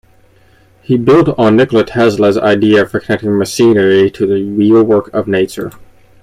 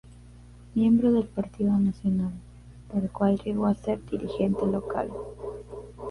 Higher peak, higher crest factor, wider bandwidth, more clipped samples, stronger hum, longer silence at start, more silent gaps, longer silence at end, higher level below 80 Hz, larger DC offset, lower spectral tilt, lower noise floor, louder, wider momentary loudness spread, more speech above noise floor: first, 0 dBFS vs -12 dBFS; second, 10 dB vs 16 dB; first, 15 kHz vs 11 kHz; neither; second, none vs 60 Hz at -45 dBFS; first, 0.9 s vs 0.05 s; neither; first, 0.4 s vs 0 s; about the same, -46 dBFS vs -48 dBFS; neither; second, -6.5 dB/octave vs -9 dB/octave; about the same, -47 dBFS vs -48 dBFS; first, -11 LUFS vs -27 LUFS; second, 7 LU vs 16 LU; first, 37 dB vs 23 dB